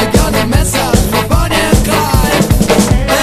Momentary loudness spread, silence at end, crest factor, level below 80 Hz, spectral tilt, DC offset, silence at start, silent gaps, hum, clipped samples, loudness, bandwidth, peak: 2 LU; 0 s; 10 dB; -16 dBFS; -4.5 dB/octave; under 0.1%; 0 s; none; none; 0.3%; -11 LUFS; 14.5 kHz; 0 dBFS